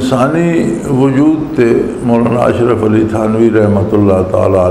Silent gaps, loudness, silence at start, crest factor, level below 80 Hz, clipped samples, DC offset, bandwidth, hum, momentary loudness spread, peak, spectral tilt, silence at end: none; -11 LUFS; 0 s; 10 dB; -36 dBFS; under 0.1%; under 0.1%; 13 kHz; none; 3 LU; 0 dBFS; -8 dB/octave; 0 s